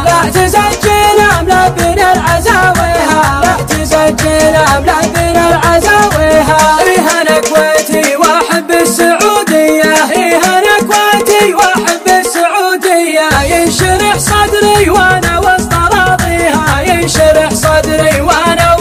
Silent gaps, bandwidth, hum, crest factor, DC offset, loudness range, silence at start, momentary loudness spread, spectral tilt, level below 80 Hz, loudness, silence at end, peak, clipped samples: none; 16.5 kHz; none; 8 dB; under 0.1%; 1 LU; 0 s; 3 LU; -3.5 dB/octave; -24 dBFS; -8 LUFS; 0 s; 0 dBFS; 0.9%